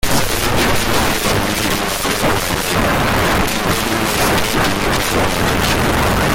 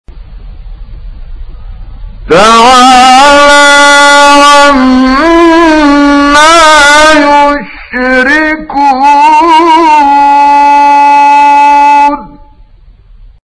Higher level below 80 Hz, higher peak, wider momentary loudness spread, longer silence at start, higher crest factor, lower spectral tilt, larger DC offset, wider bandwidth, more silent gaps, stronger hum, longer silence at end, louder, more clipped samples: about the same, -28 dBFS vs -26 dBFS; second, -4 dBFS vs 0 dBFS; second, 2 LU vs 7 LU; about the same, 0.05 s vs 0.1 s; first, 12 dB vs 4 dB; about the same, -3.5 dB/octave vs -2.5 dB/octave; neither; first, 17 kHz vs 11 kHz; neither; neither; second, 0 s vs 1.15 s; second, -15 LUFS vs -2 LUFS; second, under 0.1% vs 10%